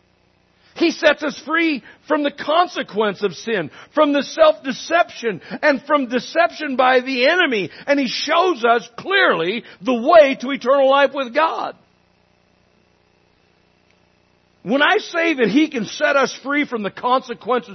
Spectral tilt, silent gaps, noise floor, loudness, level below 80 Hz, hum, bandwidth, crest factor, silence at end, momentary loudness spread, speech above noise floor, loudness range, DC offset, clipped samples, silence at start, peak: -4 dB/octave; none; -59 dBFS; -18 LUFS; -64 dBFS; none; 6.4 kHz; 18 dB; 0 s; 9 LU; 41 dB; 6 LU; under 0.1%; under 0.1%; 0.75 s; 0 dBFS